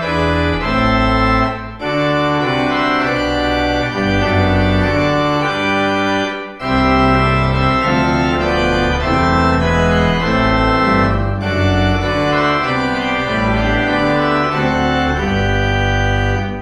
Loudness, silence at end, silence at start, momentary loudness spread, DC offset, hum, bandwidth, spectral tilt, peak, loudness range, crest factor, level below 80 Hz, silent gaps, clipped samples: -15 LUFS; 0 s; 0 s; 3 LU; under 0.1%; none; 10 kHz; -6.5 dB/octave; 0 dBFS; 1 LU; 14 dB; -26 dBFS; none; under 0.1%